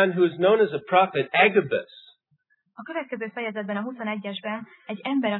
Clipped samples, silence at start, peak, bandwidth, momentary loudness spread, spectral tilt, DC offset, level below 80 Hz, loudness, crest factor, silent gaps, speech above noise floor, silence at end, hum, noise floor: under 0.1%; 0 s; -4 dBFS; 4.2 kHz; 15 LU; -9 dB/octave; under 0.1%; -80 dBFS; -24 LUFS; 20 dB; none; 45 dB; 0 s; none; -69 dBFS